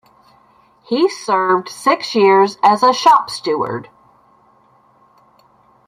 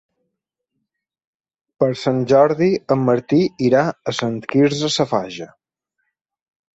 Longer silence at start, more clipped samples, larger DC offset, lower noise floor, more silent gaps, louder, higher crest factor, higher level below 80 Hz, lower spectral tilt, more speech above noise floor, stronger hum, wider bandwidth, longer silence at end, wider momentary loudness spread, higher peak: second, 0.9 s vs 1.8 s; neither; neither; second, -53 dBFS vs -79 dBFS; neither; first, -15 LUFS vs -18 LUFS; about the same, 16 dB vs 18 dB; second, -66 dBFS vs -58 dBFS; second, -4 dB/octave vs -6 dB/octave; second, 39 dB vs 61 dB; neither; first, 14.5 kHz vs 8 kHz; first, 2.05 s vs 1.25 s; about the same, 9 LU vs 9 LU; about the same, -2 dBFS vs -2 dBFS